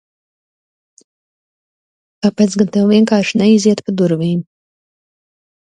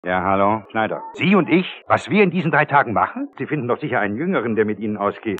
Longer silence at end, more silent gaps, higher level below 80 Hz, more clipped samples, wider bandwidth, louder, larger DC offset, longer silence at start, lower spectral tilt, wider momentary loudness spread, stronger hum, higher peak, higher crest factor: first, 1.35 s vs 0 s; neither; about the same, -60 dBFS vs -64 dBFS; neither; first, 9.6 kHz vs 8.6 kHz; first, -14 LUFS vs -19 LUFS; neither; first, 2.25 s vs 0.05 s; second, -6 dB/octave vs -7.5 dB/octave; about the same, 8 LU vs 7 LU; neither; about the same, 0 dBFS vs -2 dBFS; about the same, 16 dB vs 16 dB